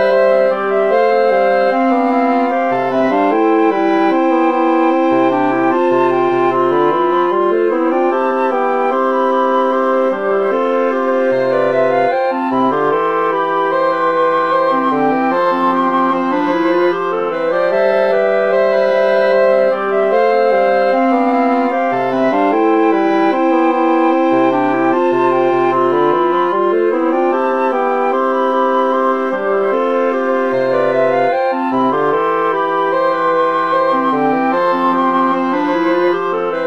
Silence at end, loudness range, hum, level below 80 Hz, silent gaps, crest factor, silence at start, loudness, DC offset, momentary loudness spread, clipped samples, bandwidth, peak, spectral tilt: 0 s; 2 LU; none; -60 dBFS; none; 12 dB; 0 s; -14 LUFS; 0.7%; 3 LU; under 0.1%; 6.6 kHz; -2 dBFS; -7 dB/octave